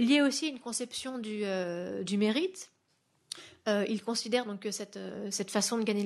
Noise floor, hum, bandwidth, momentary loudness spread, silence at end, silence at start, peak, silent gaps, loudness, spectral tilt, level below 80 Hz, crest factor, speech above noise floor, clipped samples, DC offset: -74 dBFS; none; 12.5 kHz; 12 LU; 0 s; 0 s; -14 dBFS; none; -32 LUFS; -3.5 dB/octave; -80 dBFS; 18 dB; 42 dB; under 0.1%; under 0.1%